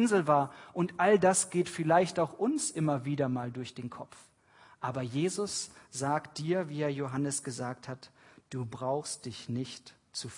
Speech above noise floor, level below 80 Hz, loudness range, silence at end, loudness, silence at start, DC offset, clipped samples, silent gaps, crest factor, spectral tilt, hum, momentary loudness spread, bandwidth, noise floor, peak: 29 dB; -74 dBFS; 7 LU; 0 s; -31 LUFS; 0 s; under 0.1%; under 0.1%; none; 20 dB; -5 dB/octave; none; 16 LU; 11 kHz; -60 dBFS; -12 dBFS